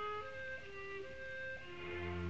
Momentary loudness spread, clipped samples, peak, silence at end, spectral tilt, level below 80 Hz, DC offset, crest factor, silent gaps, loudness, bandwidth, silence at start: 4 LU; under 0.1%; -32 dBFS; 0 s; -6 dB/octave; -66 dBFS; 0.2%; 14 dB; none; -46 LUFS; 8.4 kHz; 0 s